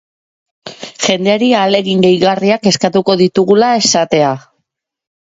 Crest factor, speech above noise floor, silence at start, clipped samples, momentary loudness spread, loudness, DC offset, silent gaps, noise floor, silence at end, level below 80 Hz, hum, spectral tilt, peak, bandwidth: 12 dB; 60 dB; 0.65 s; under 0.1%; 6 LU; -11 LUFS; under 0.1%; none; -71 dBFS; 0.8 s; -56 dBFS; none; -4 dB/octave; 0 dBFS; 8 kHz